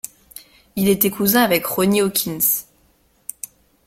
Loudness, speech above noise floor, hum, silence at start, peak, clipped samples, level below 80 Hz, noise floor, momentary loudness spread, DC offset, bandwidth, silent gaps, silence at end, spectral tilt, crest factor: -17 LUFS; 41 dB; none; 0.35 s; 0 dBFS; under 0.1%; -54 dBFS; -59 dBFS; 19 LU; under 0.1%; 16.5 kHz; none; 1.25 s; -4 dB/octave; 20 dB